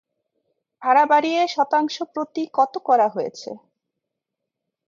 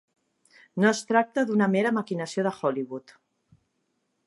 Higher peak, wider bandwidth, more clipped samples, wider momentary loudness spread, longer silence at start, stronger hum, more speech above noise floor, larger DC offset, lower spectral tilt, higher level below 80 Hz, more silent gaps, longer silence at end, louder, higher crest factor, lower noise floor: about the same, -4 dBFS vs -6 dBFS; second, 7.6 kHz vs 11.5 kHz; neither; about the same, 14 LU vs 12 LU; about the same, 0.8 s vs 0.75 s; neither; first, 63 dB vs 50 dB; neither; second, -3.5 dB/octave vs -5.5 dB/octave; about the same, -78 dBFS vs -78 dBFS; neither; about the same, 1.3 s vs 1.3 s; first, -20 LUFS vs -25 LUFS; about the same, 18 dB vs 20 dB; first, -83 dBFS vs -75 dBFS